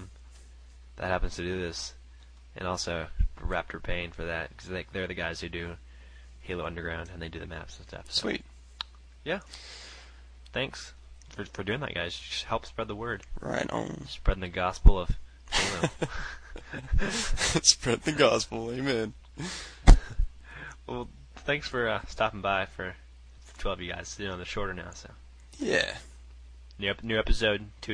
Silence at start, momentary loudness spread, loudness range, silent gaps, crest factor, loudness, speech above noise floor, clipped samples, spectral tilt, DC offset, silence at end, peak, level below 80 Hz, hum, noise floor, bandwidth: 0 s; 19 LU; 10 LU; none; 26 dB; -31 LUFS; 21 dB; under 0.1%; -3.5 dB/octave; under 0.1%; 0 s; -4 dBFS; -32 dBFS; none; -51 dBFS; 10.5 kHz